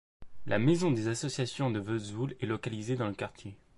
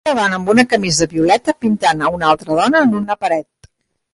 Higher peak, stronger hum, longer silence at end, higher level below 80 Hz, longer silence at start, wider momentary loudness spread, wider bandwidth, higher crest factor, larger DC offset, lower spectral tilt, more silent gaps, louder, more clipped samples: second, -14 dBFS vs 0 dBFS; neither; second, 0 s vs 0.7 s; second, -62 dBFS vs -48 dBFS; first, 0.2 s vs 0.05 s; first, 12 LU vs 6 LU; about the same, 11.5 kHz vs 11.5 kHz; about the same, 18 dB vs 16 dB; neither; first, -6 dB/octave vs -4 dB/octave; neither; second, -32 LUFS vs -15 LUFS; neither